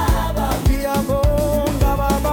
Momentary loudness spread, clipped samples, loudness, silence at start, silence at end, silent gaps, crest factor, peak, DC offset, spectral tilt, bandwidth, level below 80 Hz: 2 LU; under 0.1%; -19 LUFS; 0 s; 0 s; none; 12 dB; -6 dBFS; under 0.1%; -6 dB/octave; 18 kHz; -22 dBFS